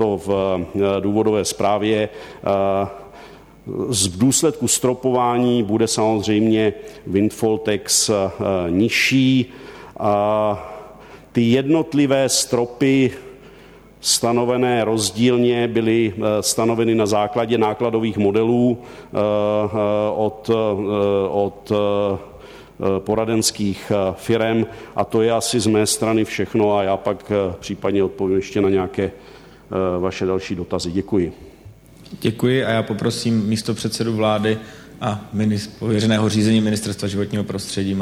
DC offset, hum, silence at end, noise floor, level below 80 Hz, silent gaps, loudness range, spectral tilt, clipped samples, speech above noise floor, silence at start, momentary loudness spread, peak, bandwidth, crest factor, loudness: under 0.1%; none; 0 s; -44 dBFS; -50 dBFS; none; 4 LU; -4.5 dB/octave; under 0.1%; 26 dB; 0 s; 8 LU; -4 dBFS; 16 kHz; 14 dB; -19 LUFS